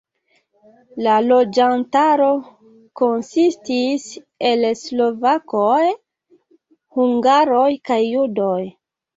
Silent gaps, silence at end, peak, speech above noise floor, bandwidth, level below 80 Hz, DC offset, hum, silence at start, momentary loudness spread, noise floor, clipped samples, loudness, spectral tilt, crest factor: none; 0.45 s; -4 dBFS; 48 dB; 8 kHz; -66 dBFS; under 0.1%; none; 0.95 s; 10 LU; -64 dBFS; under 0.1%; -17 LUFS; -5 dB/octave; 14 dB